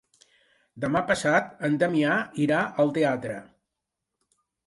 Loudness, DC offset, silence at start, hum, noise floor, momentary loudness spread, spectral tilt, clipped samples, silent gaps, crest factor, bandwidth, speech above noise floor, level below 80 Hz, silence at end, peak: -25 LUFS; under 0.1%; 0.75 s; none; -84 dBFS; 9 LU; -6 dB/octave; under 0.1%; none; 18 dB; 11.5 kHz; 60 dB; -64 dBFS; 1.25 s; -8 dBFS